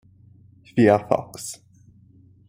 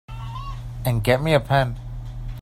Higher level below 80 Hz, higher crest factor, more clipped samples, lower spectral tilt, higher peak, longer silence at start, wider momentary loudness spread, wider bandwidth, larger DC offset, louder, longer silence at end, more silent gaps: second, -62 dBFS vs -36 dBFS; about the same, 22 dB vs 20 dB; neither; about the same, -6 dB/octave vs -6.5 dB/octave; about the same, -2 dBFS vs -2 dBFS; first, 0.75 s vs 0.1 s; about the same, 17 LU vs 16 LU; about the same, 16 kHz vs 16 kHz; neither; about the same, -21 LUFS vs -22 LUFS; first, 0.95 s vs 0 s; neither